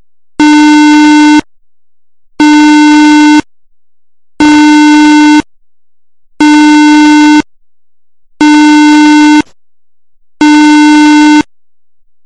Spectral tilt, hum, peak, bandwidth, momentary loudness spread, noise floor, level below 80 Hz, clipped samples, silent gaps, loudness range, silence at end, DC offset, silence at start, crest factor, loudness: -2.5 dB/octave; none; 0 dBFS; 9.8 kHz; 6 LU; -87 dBFS; -40 dBFS; under 0.1%; none; 2 LU; 0.85 s; 0.8%; 0.4 s; 4 dB; -4 LUFS